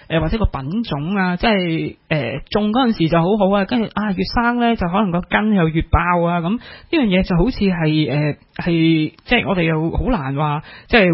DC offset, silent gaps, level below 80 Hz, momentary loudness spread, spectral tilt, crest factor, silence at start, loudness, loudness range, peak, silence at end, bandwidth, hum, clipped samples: under 0.1%; none; -30 dBFS; 6 LU; -11 dB/octave; 18 dB; 0.1 s; -18 LUFS; 1 LU; 0 dBFS; 0 s; 5.8 kHz; none; under 0.1%